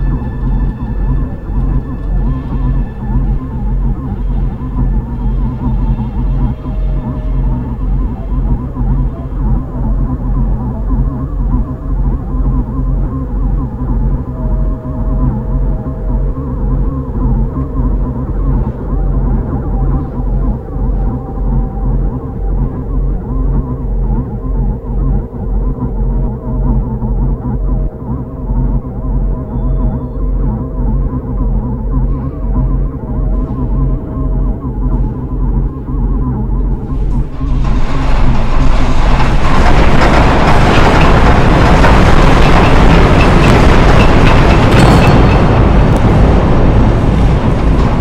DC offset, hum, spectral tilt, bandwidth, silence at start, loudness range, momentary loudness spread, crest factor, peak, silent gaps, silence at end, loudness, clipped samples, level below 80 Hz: under 0.1%; none; -7.5 dB/octave; 9 kHz; 0 s; 10 LU; 10 LU; 10 dB; 0 dBFS; none; 0 s; -14 LUFS; under 0.1%; -14 dBFS